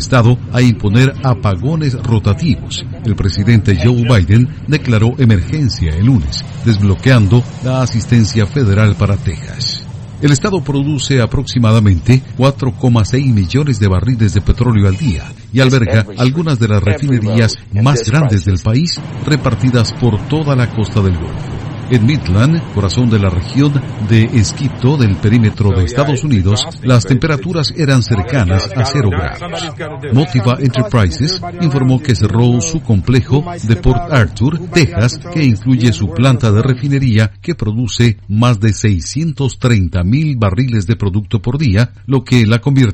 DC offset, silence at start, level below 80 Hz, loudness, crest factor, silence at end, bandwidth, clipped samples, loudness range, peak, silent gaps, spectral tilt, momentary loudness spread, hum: under 0.1%; 0 s; -30 dBFS; -13 LUFS; 12 dB; 0 s; 8.8 kHz; 0.6%; 2 LU; 0 dBFS; none; -6.5 dB/octave; 6 LU; none